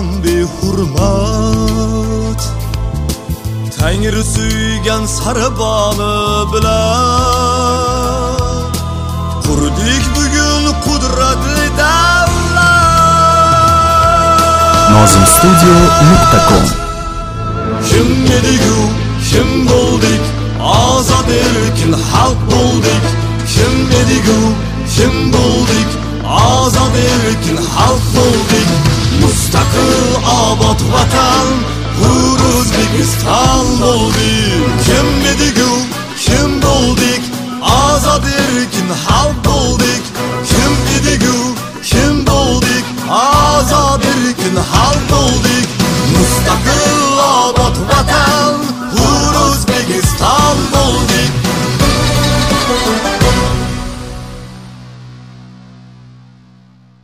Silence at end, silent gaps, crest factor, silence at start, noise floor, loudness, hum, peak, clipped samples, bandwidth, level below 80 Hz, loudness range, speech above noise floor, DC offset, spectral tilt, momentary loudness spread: 1.5 s; none; 10 dB; 0 s; -43 dBFS; -11 LUFS; none; 0 dBFS; 0.1%; 16.5 kHz; -20 dBFS; 6 LU; 33 dB; under 0.1%; -4.5 dB/octave; 9 LU